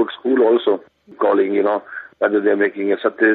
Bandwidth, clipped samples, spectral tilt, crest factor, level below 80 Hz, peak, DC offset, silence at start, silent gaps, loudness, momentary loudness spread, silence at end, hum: 4.1 kHz; under 0.1%; -9 dB/octave; 16 dB; -70 dBFS; -2 dBFS; under 0.1%; 0 s; none; -18 LUFS; 7 LU; 0 s; none